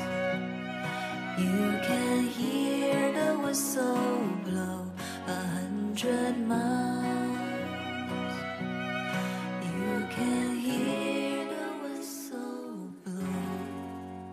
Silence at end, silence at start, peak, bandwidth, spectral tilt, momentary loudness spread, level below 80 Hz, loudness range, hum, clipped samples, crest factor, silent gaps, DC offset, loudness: 0 s; 0 s; -16 dBFS; 15.5 kHz; -5 dB/octave; 10 LU; -74 dBFS; 5 LU; none; under 0.1%; 14 dB; none; under 0.1%; -31 LUFS